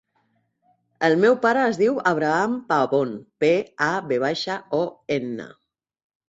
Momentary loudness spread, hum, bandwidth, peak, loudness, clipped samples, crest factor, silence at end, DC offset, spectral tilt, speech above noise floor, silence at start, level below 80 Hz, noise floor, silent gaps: 9 LU; none; 8 kHz; -4 dBFS; -22 LUFS; under 0.1%; 18 dB; 0.8 s; under 0.1%; -5.5 dB/octave; 47 dB; 1 s; -68 dBFS; -68 dBFS; none